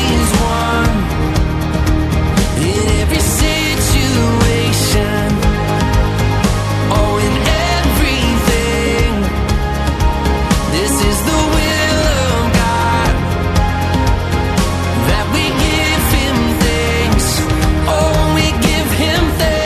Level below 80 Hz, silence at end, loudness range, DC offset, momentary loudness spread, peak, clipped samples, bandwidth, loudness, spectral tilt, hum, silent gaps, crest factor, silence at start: -18 dBFS; 0 s; 1 LU; under 0.1%; 3 LU; 0 dBFS; under 0.1%; 14 kHz; -14 LUFS; -4.5 dB/octave; none; none; 12 dB; 0 s